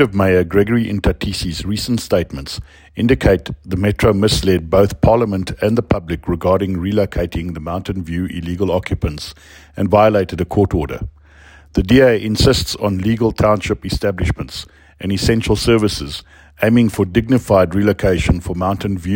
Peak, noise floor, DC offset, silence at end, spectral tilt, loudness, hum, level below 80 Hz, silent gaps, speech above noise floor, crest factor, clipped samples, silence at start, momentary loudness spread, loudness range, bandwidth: 0 dBFS; -43 dBFS; under 0.1%; 0 s; -6 dB/octave; -16 LUFS; none; -30 dBFS; none; 28 dB; 16 dB; under 0.1%; 0 s; 11 LU; 4 LU; 16.5 kHz